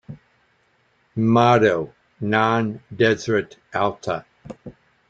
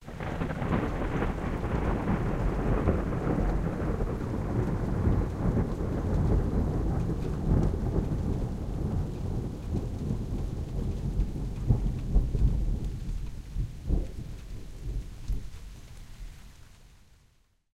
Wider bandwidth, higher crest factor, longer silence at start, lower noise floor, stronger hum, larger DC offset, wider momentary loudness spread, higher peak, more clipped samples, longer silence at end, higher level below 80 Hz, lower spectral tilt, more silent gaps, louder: second, 7.8 kHz vs 11 kHz; about the same, 20 dB vs 20 dB; about the same, 0.1 s vs 0 s; about the same, -63 dBFS vs -65 dBFS; neither; neither; first, 21 LU vs 12 LU; first, -2 dBFS vs -10 dBFS; neither; second, 0.4 s vs 0.85 s; second, -58 dBFS vs -32 dBFS; second, -6.5 dB/octave vs -8.5 dB/octave; neither; first, -20 LUFS vs -31 LUFS